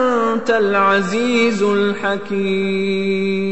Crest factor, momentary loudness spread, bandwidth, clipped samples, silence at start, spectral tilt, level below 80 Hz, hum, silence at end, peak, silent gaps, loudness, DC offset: 12 dB; 5 LU; 8.4 kHz; under 0.1%; 0 s; -5.5 dB/octave; -56 dBFS; none; 0 s; -4 dBFS; none; -17 LUFS; 2%